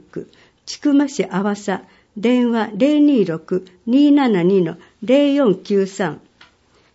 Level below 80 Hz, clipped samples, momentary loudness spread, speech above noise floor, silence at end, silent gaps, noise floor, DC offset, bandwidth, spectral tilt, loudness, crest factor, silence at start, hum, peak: -66 dBFS; under 0.1%; 14 LU; 38 dB; 0.75 s; none; -54 dBFS; under 0.1%; 8 kHz; -6.5 dB/octave; -17 LUFS; 14 dB; 0.15 s; none; -2 dBFS